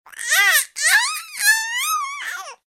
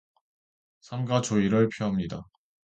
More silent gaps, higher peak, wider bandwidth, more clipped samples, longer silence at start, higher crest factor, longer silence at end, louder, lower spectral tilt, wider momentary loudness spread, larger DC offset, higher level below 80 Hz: neither; first, -2 dBFS vs -10 dBFS; first, 16.5 kHz vs 9.2 kHz; neither; second, 0.1 s vs 0.9 s; about the same, 18 dB vs 18 dB; second, 0.1 s vs 0.45 s; first, -17 LUFS vs -27 LUFS; second, 6 dB/octave vs -6 dB/octave; about the same, 12 LU vs 14 LU; neither; second, -74 dBFS vs -56 dBFS